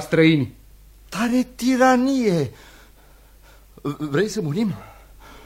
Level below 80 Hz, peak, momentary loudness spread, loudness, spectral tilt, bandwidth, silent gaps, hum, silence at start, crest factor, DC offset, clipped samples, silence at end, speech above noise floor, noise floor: -50 dBFS; -4 dBFS; 15 LU; -21 LUFS; -6 dB/octave; 16 kHz; none; none; 0 s; 18 dB; under 0.1%; under 0.1%; 0.05 s; 30 dB; -49 dBFS